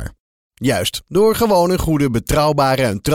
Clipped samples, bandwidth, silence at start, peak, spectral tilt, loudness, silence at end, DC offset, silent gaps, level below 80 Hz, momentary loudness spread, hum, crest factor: under 0.1%; 17.5 kHz; 0 s; -4 dBFS; -5.5 dB/octave; -16 LUFS; 0 s; under 0.1%; 0.20-0.51 s; -32 dBFS; 5 LU; none; 12 dB